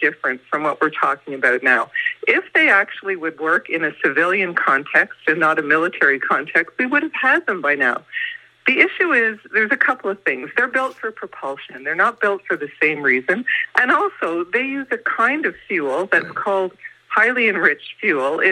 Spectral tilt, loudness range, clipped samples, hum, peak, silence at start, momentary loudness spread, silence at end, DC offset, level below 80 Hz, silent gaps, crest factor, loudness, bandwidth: -5 dB/octave; 3 LU; under 0.1%; none; 0 dBFS; 0 s; 9 LU; 0 s; under 0.1%; -72 dBFS; none; 18 dB; -18 LUFS; 11 kHz